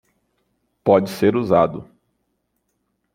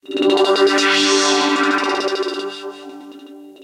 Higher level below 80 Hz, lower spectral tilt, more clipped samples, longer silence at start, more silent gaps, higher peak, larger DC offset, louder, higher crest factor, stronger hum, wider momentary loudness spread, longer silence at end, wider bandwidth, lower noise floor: first, -58 dBFS vs -68 dBFS; first, -7.5 dB/octave vs -1.5 dB/octave; neither; first, 0.85 s vs 0.1 s; neither; about the same, -2 dBFS vs -4 dBFS; neither; second, -18 LUFS vs -15 LUFS; first, 20 dB vs 14 dB; neither; second, 8 LU vs 19 LU; first, 1.3 s vs 0.1 s; first, 16.5 kHz vs 12.5 kHz; first, -72 dBFS vs -38 dBFS